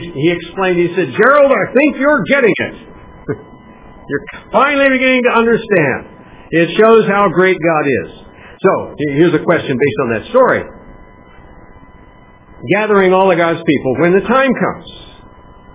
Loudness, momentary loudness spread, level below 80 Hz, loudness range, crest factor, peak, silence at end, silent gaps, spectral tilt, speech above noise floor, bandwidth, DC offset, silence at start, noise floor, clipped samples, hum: -12 LUFS; 13 LU; -44 dBFS; 4 LU; 14 dB; 0 dBFS; 0.7 s; none; -10 dB/octave; 29 dB; 4 kHz; under 0.1%; 0 s; -41 dBFS; under 0.1%; none